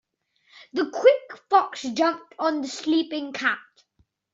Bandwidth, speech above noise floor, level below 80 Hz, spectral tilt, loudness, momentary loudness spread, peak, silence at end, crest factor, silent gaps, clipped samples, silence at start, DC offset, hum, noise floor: 7.8 kHz; 44 dB; -74 dBFS; -3 dB/octave; -24 LUFS; 10 LU; -4 dBFS; 0.75 s; 20 dB; none; under 0.1%; 0.6 s; under 0.1%; none; -68 dBFS